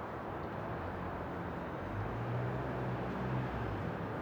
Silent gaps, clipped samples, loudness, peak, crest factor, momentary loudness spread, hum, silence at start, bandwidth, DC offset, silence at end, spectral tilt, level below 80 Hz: none; under 0.1%; -39 LUFS; -26 dBFS; 14 dB; 4 LU; none; 0 s; over 20 kHz; under 0.1%; 0 s; -8.5 dB/octave; -52 dBFS